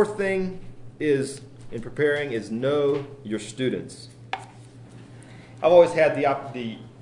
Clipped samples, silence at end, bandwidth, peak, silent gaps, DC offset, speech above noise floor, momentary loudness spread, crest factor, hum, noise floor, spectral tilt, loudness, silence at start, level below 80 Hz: under 0.1%; 0 s; 11 kHz; -4 dBFS; none; under 0.1%; 22 dB; 22 LU; 22 dB; none; -45 dBFS; -6 dB/octave; -24 LUFS; 0 s; -54 dBFS